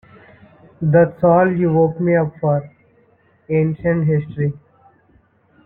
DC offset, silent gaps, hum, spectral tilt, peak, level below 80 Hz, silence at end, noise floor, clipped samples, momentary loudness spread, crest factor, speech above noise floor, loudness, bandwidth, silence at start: under 0.1%; none; none; -13 dB/octave; -2 dBFS; -50 dBFS; 1.1 s; -56 dBFS; under 0.1%; 9 LU; 16 dB; 40 dB; -17 LUFS; 2.9 kHz; 0.8 s